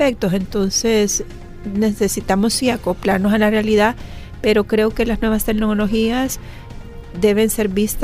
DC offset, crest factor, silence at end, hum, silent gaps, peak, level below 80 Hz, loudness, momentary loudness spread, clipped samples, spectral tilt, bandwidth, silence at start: under 0.1%; 14 dB; 0 s; none; none; -2 dBFS; -32 dBFS; -17 LUFS; 17 LU; under 0.1%; -4.5 dB/octave; 16 kHz; 0 s